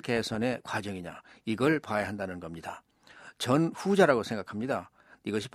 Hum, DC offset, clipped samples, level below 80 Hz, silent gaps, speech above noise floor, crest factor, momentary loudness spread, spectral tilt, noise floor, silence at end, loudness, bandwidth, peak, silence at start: none; under 0.1%; under 0.1%; -66 dBFS; none; 24 dB; 22 dB; 17 LU; -5.5 dB/octave; -54 dBFS; 0.05 s; -30 LUFS; 15 kHz; -8 dBFS; 0.05 s